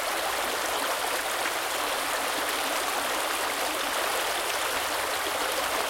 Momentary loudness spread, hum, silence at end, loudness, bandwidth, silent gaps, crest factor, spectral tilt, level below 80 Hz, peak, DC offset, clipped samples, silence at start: 1 LU; none; 0 s; -27 LUFS; 17 kHz; none; 18 dB; 0 dB/octave; -58 dBFS; -12 dBFS; under 0.1%; under 0.1%; 0 s